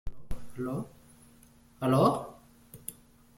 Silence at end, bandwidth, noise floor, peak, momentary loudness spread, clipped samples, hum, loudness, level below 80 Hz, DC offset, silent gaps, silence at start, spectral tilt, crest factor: 0.45 s; 16.5 kHz; -58 dBFS; -12 dBFS; 22 LU; under 0.1%; none; -29 LUFS; -50 dBFS; under 0.1%; none; 0.05 s; -7 dB/octave; 20 dB